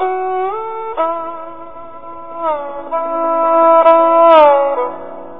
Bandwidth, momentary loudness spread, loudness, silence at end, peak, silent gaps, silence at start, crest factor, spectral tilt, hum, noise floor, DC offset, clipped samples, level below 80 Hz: 4.2 kHz; 23 LU; -13 LUFS; 0 s; 0 dBFS; none; 0 s; 14 dB; -7 dB/octave; none; -32 dBFS; 2%; 0.2%; -56 dBFS